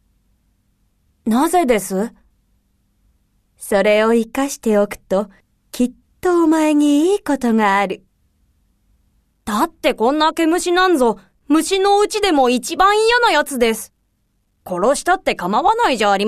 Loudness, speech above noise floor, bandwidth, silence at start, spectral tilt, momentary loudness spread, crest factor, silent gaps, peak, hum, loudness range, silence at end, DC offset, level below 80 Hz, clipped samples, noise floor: -16 LUFS; 49 dB; 14 kHz; 1.25 s; -4 dB/octave; 10 LU; 16 dB; none; 0 dBFS; none; 5 LU; 0 s; under 0.1%; -46 dBFS; under 0.1%; -65 dBFS